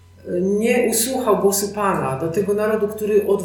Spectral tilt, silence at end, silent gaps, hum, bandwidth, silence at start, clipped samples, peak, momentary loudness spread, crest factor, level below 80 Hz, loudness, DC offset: -4.5 dB/octave; 0 s; none; none; 19 kHz; 0.25 s; under 0.1%; -4 dBFS; 5 LU; 16 dB; -58 dBFS; -19 LUFS; under 0.1%